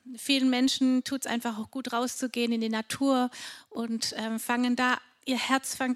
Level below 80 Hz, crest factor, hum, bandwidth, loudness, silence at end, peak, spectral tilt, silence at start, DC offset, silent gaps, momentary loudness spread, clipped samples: -74 dBFS; 20 dB; none; 15 kHz; -28 LUFS; 0 s; -8 dBFS; -2.5 dB/octave; 0.05 s; under 0.1%; none; 9 LU; under 0.1%